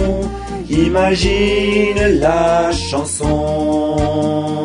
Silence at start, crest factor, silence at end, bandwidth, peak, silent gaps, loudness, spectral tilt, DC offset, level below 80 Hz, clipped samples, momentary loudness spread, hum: 0 s; 14 dB; 0 s; 10.5 kHz; -2 dBFS; none; -15 LUFS; -5 dB/octave; under 0.1%; -26 dBFS; under 0.1%; 6 LU; none